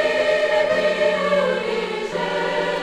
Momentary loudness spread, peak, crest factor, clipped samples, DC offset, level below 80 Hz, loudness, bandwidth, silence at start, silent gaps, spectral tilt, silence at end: 6 LU; -8 dBFS; 12 dB; under 0.1%; under 0.1%; -56 dBFS; -20 LUFS; 11.5 kHz; 0 s; none; -4 dB/octave; 0 s